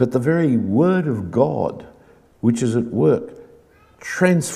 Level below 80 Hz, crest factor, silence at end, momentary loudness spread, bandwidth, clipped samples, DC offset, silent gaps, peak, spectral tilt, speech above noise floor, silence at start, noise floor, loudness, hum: -56 dBFS; 18 dB; 0 s; 11 LU; 14.5 kHz; under 0.1%; under 0.1%; none; -2 dBFS; -7 dB/octave; 33 dB; 0 s; -51 dBFS; -19 LUFS; none